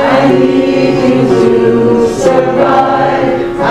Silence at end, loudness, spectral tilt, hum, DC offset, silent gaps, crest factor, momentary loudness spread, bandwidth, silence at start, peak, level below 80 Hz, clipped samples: 0 s; -9 LUFS; -6.5 dB/octave; none; 0.4%; none; 8 dB; 3 LU; 11.5 kHz; 0 s; 0 dBFS; -36 dBFS; 0.5%